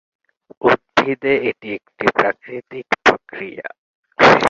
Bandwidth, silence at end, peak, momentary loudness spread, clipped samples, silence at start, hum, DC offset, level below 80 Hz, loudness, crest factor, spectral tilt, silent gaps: 7.8 kHz; 0 s; 0 dBFS; 16 LU; under 0.1%; 0.65 s; none; under 0.1%; -54 dBFS; -17 LUFS; 18 dB; -4.5 dB/octave; 3.78-4.03 s